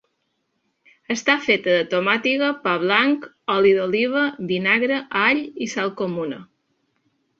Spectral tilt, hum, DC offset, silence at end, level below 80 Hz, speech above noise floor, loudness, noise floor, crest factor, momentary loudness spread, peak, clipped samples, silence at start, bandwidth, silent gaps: -4.5 dB/octave; none; under 0.1%; 0.95 s; -66 dBFS; 52 dB; -20 LUFS; -72 dBFS; 20 dB; 8 LU; -2 dBFS; under 0.1%; 1.1 s; 7.8 kHz; none